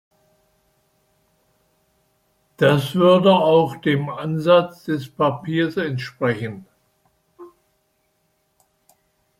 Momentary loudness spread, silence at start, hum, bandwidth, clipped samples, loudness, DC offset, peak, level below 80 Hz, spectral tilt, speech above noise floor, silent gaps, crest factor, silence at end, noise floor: 13 LU; 2.6 s; none; 15.5 kHz; under 0.1%; -19 LUFS; under 0.1%; -4 dBFS; -64 dBFS; -7 dB/octave; 49 dB; none; 18 dB; 1.9 s; -68 dBFS